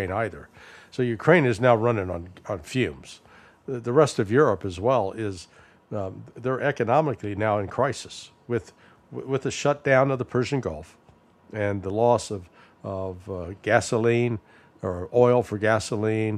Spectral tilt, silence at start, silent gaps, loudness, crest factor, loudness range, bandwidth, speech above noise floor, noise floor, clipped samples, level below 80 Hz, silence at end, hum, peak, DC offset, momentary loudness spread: -6 dB/octave; 0 s; none; -24 LUFS; 22 dB; 3 LU; 13 kHz; 31 dB; -55 dBFS; under 0.1%; -56 dBFS; 0 s; none; -2 dBFS; under 0.1%; 16 LU